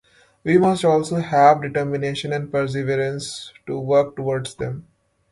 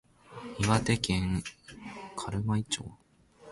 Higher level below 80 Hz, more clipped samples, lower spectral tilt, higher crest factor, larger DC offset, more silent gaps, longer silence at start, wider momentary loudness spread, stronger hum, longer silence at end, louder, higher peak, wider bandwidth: second, -56 dBFS vs -48 dBFS; neither; about the same, -6 dB/octave vs -5 dB/octave; about the same, 20 dB vs 24 dB; neither; neither; first, 0.45 s vs 0.3 s; second, 15 LU vs 19 LU; neither; first, 0.5 s vs 0 s; first, -20 LUFS vs -31 LUFS; first, 0 dBFS vs -8 dBFS; about the same, 11.5 kHz vs 11.5 kHz